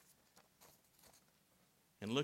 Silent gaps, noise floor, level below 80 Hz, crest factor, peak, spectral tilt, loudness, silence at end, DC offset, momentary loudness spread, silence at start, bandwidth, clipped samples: none; -75 dBFS; -86 dBFS; 26 dB; -22 dBFS; -5 dB/octave; -44 LUFS; 0 s; under 0.1%; 21 LU; 0.6 s; 16 kHz; under 0.1%